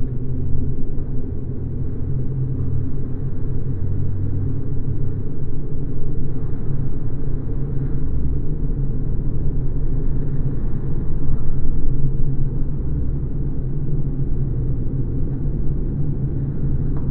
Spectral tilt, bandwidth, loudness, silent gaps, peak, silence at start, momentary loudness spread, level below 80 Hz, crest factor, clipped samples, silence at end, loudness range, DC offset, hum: -14 dB/octave; 1.6 kHz; -25 LUFS; none; -2 dBFS; 0 s; 4 LU; -22 dBFS; 14 dB; under 0.1%; 0 s; 2 LU; under 0.1%; none